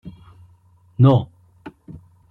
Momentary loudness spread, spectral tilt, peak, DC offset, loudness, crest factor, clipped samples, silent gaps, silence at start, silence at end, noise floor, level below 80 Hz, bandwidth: 27 LU; -10.5 dB/octave; -4 dBFS; under 0.1%; -17 LUFS; 18 dB; under 0.1%; none; 0.05 s; 0.6 s; -54 dBFS; -52 dBFS; 4.1 kHz